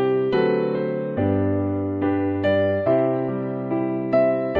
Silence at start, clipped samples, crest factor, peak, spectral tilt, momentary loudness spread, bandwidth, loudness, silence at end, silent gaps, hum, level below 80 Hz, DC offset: 0 s; under 0.1%; 14 dB; -8 dBFS; -10 dB/octave; 5 LU; 5 kHz; -22 LUFS; 0 s; none; none; -60 dBFS; under 0.1%